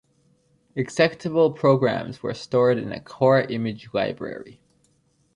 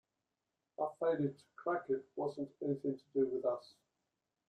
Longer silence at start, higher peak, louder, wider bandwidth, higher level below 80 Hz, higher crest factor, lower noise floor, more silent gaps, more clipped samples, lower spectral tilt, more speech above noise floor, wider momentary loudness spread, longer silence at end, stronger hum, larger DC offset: about the same, 0.75 s vs 0.8 s; first, -6 dBFS vs -22 dBFS; first, -22 LUFS vs -39 LUFS; first, 10.5 kHz vs 9.2 kHz; first, -62 dBFS vs -82 dBFS; about the same, 18 dB vs 16 dB; second, -65 dBFS vs -89 dBFS; neither; neither; second, -6.5 dB/octave vs -8.5 dB/octave; second, 43 dB vs 51 dB; first, 14 LU vs 6 LU; about the same, 0.85 s vs 0.9 s; neither; neither